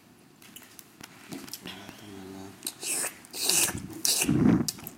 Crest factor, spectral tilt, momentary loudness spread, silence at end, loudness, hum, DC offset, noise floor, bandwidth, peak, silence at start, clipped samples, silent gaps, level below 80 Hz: 28 dB; -3 dB/octave; 24 LU; 0 s; -26 LUFS; none; under 0.1%; -54 dBFS; 17 kHz; -4 dBFS; 0.4 s; under 0.1%; none; -56 dBFS